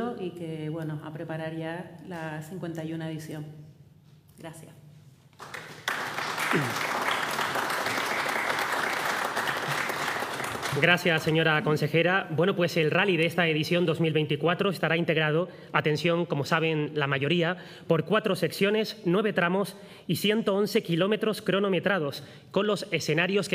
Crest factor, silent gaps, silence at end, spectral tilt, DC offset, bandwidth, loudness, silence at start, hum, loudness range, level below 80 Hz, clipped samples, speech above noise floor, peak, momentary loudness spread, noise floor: 22 dB; none; 0 s; -5 dB/octave; under 0.1%; 16 kHz; -27 LUFS; 0 s; none; 12 LU; -72 dBFS; under 0.1%; 28 dB; -6 dBFS; 13 LU; -55 dBFS